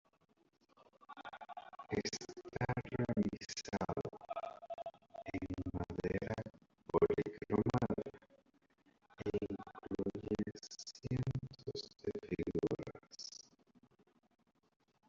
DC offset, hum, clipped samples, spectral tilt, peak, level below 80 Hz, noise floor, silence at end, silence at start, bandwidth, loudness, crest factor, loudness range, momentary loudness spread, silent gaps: under 0.1%; none; under 0.1%; -6 dB/octave; -18 dBFS; -64 dBFS; -74 dBFS; 1.75 s; 0.8 s; 7.8 kHz; -41 LUFS; 24 dB; 5 LU; 15 LU; none